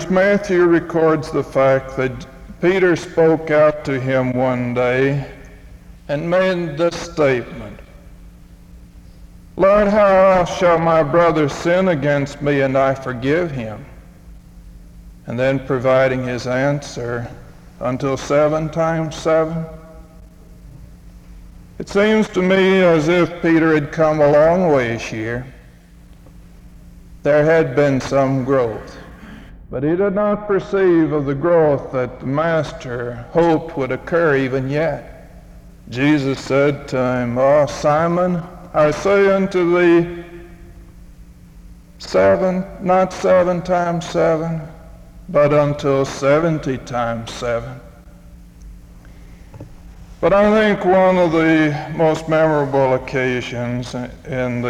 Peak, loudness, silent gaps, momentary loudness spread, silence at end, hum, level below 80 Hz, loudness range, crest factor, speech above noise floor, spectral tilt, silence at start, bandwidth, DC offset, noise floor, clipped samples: -4 dBFS; -17 LUFS; none; 12 LU; 0 s; none; -42 dBFS; 6 LU; 14 dB; 27 dB; -6.5 dB/octave; 0 s; 12 kHz; under 0.1%; -43 dBFS; under 0.1%